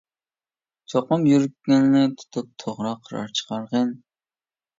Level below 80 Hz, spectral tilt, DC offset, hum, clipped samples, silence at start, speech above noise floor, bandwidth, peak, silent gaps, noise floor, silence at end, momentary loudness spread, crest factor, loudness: -68 dBFS; -6 dB/octave; under 0.1%; none; under 0.1%; 0.9 s; over 68 dB; 7.8 kHz; -8 dBFS; none; under -90 dBFS; 0.8 s; 14 LU; 16 dB; -22 LUFS